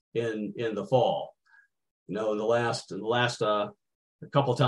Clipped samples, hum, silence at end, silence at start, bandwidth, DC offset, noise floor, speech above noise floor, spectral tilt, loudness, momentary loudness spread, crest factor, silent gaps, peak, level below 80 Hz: under 0.1%; none; 0 s; 0.15 s; 11.5 kHz; under 0.1%; -63 dBFS; 36 dB; -5.5 dB/octave; -29 LUFS; 9 LU; 20 dB; 1.91-2.06 s, 3.95-4.19 s; -8 dBFS; -72 dBFS